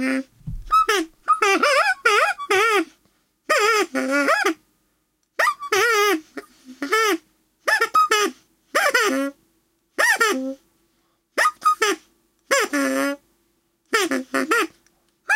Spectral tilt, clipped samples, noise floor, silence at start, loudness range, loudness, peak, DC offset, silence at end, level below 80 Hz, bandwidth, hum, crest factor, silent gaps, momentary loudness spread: -1.5 dB/octave; under 0.1%; -69 dBFS; 0 s; 4 LU; -20 LUFS; -4 dBFS; under 0.1%; 0 s; -50 dBFS; 16.5 kHz; none; 18 dB; none; 14 LU